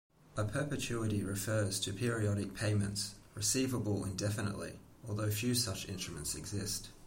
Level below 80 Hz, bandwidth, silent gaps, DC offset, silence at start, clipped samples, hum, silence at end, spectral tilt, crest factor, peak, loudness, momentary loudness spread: -58 dBFS; 16.5 kHz; none; under 0.1%; 0.3 s; under 0.1%; none; 0 s; -4.5 dB/octave; 16 dB; -20 dBFS; -36 LUFS; 8 LU